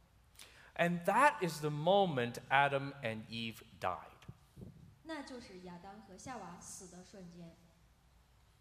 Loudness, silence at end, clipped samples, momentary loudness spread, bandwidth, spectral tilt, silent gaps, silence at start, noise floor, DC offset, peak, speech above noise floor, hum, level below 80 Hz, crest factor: -35 LUFS; 1.1 s; under 0.1%; 25 LU; 15.5 kHz; -5 dB/octave; none; 0.4 s; -67 dBFS; under 0.1%; -12 dBFS; 31 dB; none; -70 dBFS; 26 dB